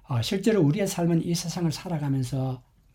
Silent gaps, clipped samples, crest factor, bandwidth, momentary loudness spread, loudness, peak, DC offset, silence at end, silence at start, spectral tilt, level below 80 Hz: none; under 0.1%; 16 dB; 17 kHz; 8 LU; -26 LUFS; -10 dBFS; under 0.1%; 0.35 s; 0.1 s; -6 dB/octave; -54 dBFS